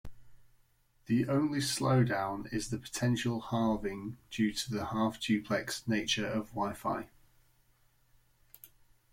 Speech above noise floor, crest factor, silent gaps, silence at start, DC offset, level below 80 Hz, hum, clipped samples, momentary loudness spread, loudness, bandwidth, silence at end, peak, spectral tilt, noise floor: 36 dB; 18 dB; none; 0.05 s; under 0.1%; -60 dBFS; none; under 0.1%; 8 LU; -33 LUFS; 16.5 kHz; 0.45 s; -16 dBFS; -5 dB/octave; -68 dBFS